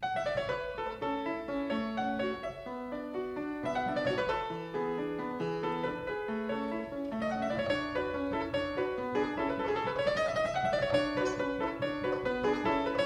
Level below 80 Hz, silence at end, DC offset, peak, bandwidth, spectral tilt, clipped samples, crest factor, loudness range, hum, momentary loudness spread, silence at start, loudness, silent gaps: -56 dBFS; 0 s; under 0.1%; -16 dBFS; 13 kHz; -5.5 dB/octave; under 0.1%; 18 dB; 4 LU; none; 6 LU; 0 s; -33 LUFS; none